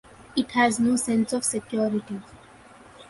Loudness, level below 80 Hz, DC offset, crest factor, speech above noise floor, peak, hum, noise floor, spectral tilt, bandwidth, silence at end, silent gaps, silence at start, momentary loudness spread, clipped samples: -24 LUFS; -60 dBFS; under 0.1%; 18 dB; 26 dB; -8 dBFS; none; -50 dBFS; -3.5 dB/octave; 12 kHz; 0.05 s; none; 0.2 s; 10 LU; under 0.1%